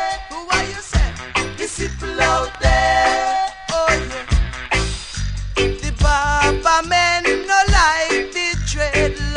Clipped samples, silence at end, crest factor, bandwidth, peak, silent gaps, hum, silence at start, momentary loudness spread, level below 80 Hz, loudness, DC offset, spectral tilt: under 0.1%; 0 s; 16 dB; 10.5 kHz; -2 dBFS; none; none; 0 s; 10 LU; -24 dBFS; -18 LUFS; under 0.1%; -3.5 dB/octave